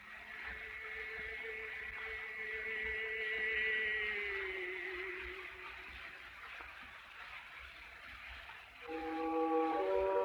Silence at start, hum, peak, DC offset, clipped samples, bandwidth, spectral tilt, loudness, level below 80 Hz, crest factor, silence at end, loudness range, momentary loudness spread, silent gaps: 0 s; none; -24 dBFS; under 0.1%; under 0.1%; over 20 kHz; -4.5 dB/octave; -40 LUFS; -64 dBFS; 18 dB; 0 s; 11 LU; 16 LU; none